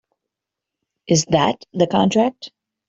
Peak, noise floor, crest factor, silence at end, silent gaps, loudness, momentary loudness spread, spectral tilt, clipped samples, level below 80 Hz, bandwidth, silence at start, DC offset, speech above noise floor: -2 dBFS; -84 dBFS; 18 dB; 0.4 s; none; -18 LUFS; 13 LU; -5 dB/octave; under 0.1%; -56 dBFS; 8 kHz; 1.1 s; under 0.1%; 67 dB